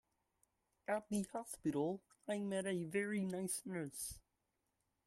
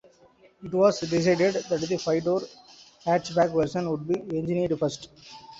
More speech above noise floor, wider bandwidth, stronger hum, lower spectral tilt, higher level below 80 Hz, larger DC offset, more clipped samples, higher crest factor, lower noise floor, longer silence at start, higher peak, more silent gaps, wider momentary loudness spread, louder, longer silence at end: first, 45 dB vs 32 dB; first, 14.5 kHz vs 8 kHz; neither; about the same, -5 dB/octave vs -6 dB/octave; second, -74 dBFS vs -60 dBFS; neither; neither; about the same, 20 dB vs 18 dB; first, -86 dBFS vs -58 dBFS; first, 0.9 s vs 0.6 s; second, -24 dBFS vs -8 dBFS; neither; second, 7 LU vs 14 LU; second, -42 LUFS vs -26 LUFS; first, 0.85 s vs 0 s